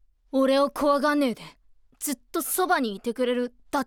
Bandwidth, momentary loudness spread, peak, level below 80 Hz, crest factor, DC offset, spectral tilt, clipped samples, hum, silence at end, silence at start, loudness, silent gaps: 19.5 kHz; 9 LU; -10 dBFS; -60 dBFS; 16 dB; under 0.1%; -3 dB/octave; under 0.1%; none; 0 s; 0.35 s; -25 LUFS; none